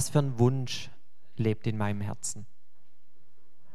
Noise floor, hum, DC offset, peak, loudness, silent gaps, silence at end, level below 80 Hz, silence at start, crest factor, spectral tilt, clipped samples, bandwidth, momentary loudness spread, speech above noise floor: -74 dBFS; none; 2%; -10 dBFS; -30 LUFS; none; 1.3 s; -64 dBFS; 0 s; 22 dB; -5.5 dB/octave; under 0.1%; 14.5 kHz; 16 LU; 45 dB